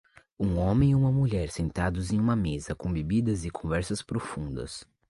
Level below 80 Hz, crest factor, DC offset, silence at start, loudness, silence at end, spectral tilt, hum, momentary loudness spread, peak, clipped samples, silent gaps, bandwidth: -42 dBFS; 16 dB; under 0.1%; 0.4 s; -28 LUFS; 0.25 s; -7 dB/octave; none; 11 LU; -12 dBFS; under 0.1%; none; 11.5 kHz